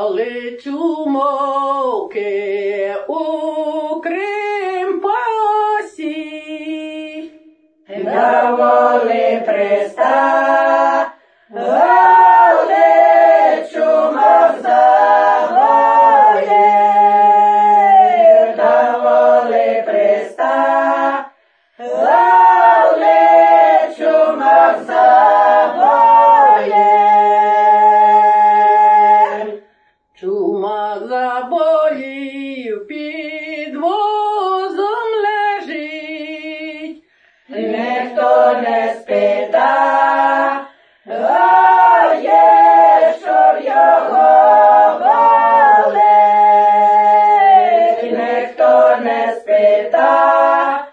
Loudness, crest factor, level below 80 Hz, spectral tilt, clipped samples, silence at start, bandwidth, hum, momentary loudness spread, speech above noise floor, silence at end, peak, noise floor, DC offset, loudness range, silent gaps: -11 LUFS; 12 dB; -70 dBFS; -5 dB/octave; under 0.1%; 0 s; 8 kHz; none; 16 LU; 39 dB; 0.05 s; 0 dBFS; -57 dBFS; under 0.1%; 10 LU; none